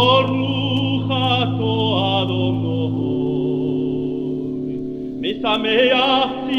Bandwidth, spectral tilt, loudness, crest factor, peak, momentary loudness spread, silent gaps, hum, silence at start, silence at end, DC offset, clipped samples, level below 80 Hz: 6.6 kHz; -7.5 dB/octave; -19 LUFS; 16 dB; -2 dBFS; 10 LU; none; none; 0 s; 0 s; under 0.1%; under 0.1%; -48 dBFS